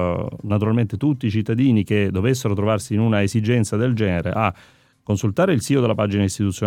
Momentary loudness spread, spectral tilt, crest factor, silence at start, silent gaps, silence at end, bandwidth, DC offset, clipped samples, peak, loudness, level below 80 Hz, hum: 5 LU; -6.5 dB/octave; 16 dB; 0 s; none; 0 s; 15.5 kHz; under 0.1%; under 0.1%; -2 dBFS; -20 LUFS; -52 dBFS; none